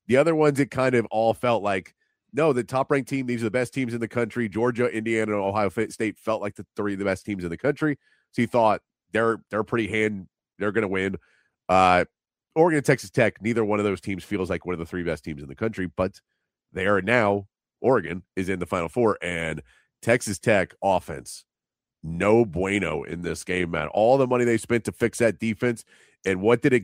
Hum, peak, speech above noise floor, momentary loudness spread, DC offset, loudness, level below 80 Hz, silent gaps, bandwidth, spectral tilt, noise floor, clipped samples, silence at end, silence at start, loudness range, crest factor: none; -4 dBFS; over 66 dB; 11 LU; under 0.1%; -24 LUFS; -54 dBFS; none; 16 kHz; -6 dB/octave; under -90 dBFS; under 0.1%; 0 s; 0.1 s; 4 LU; 20 dB